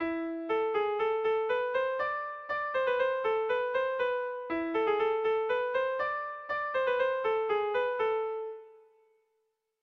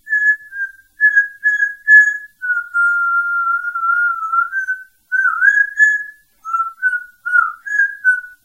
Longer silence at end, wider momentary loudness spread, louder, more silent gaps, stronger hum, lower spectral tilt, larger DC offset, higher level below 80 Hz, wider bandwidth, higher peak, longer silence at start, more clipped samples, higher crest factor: first, 1.05 s vs 0.1 s; second, 6 LU vs 12 LU; second, -31 LUFS vs -14 LUFS; neither; neither; first, -5.5 dB/octave vs 3 dB/octave; neither; about the same, -70 dBFS vs -68 dBFS; second, 6 kHz vs 15.5 kHz; second, -18 dBFS vs 0 dBFS; about the same, 0 s vs 0.05 s; neither; about the same, 14 dB vs 16 dB